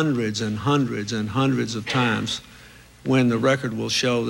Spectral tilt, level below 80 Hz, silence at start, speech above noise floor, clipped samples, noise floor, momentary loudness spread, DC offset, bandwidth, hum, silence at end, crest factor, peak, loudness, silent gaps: -5 dB/octave; -56 dBFS; 0 s; 25 dB; under 0.1%; -47 dBFS; 6 LU; under 0.1%; 16 kHz; none; 0 s; 14 dB; -8 dBFS; -23 LUFS; none